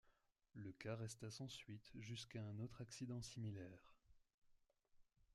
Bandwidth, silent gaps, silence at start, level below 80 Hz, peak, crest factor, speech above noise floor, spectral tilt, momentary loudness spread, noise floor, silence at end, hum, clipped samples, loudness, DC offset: 13 kHz; 4.34-4.42 s; 0.05 s; -78 dBFS; -36 dBFS; 18 dB; 28 dB; -5 dB/octave; 8 LU; -80 dBFS; 0.1 s; none; under 0.1%; -54 LUFS; under 0.1%